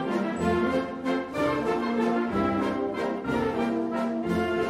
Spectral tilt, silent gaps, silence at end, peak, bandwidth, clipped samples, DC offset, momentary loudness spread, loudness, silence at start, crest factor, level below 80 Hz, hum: -6.5 dB/octave; none; 0 s; -12 dBFS; 13.5 kHz; under 0.1%; under 0.1%; 3 LU; -27 LUFS; 0 s; 14 dB; -52 dBFS; none